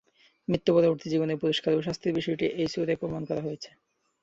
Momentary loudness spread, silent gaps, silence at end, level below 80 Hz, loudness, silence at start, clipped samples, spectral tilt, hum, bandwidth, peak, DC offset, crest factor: 11 LU; none; 0.55 s; -60 dBFS; -28 LUFS; 0.5 s; under 0.1%; -6.5 dB/octave; none; 8 kHz; -10 dBFS; under 0.1%; 18 dB